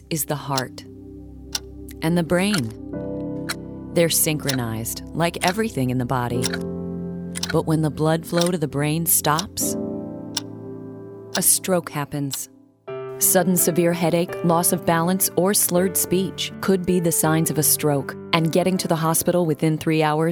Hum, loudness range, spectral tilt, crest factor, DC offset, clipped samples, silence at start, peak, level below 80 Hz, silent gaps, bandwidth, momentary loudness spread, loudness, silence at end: none; 5 LU; -4 dB/octave; 20 dB; under 0.1%; under 0.1%; 0 s; -2 dBFS; -50 dBFS; none; over 20 kHz; 13 LU; -21 LUFS; 0 s